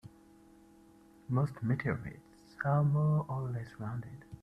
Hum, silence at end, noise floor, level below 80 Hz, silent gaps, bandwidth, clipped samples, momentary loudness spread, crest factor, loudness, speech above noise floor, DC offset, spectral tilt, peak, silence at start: none; 0.05 s; -60 dBFS; -62 dBFS; none; 5.6 kHz; under 0.1%; 19 LU; 18 dB; -34 LUFS; 27 dB; under 0.1%; -9.5 dB/octave; -18 dBFS; 0.05 s